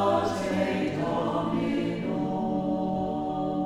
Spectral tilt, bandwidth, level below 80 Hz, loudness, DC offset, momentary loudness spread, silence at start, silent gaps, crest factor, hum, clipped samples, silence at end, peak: -7 dB/octave; 13 kHz; -54 dBFS; -28 LUFS; under 0.1%; 3 LU; 0 s; none; 16 dB; none; under 0.1%; 0 s; -12 dBFS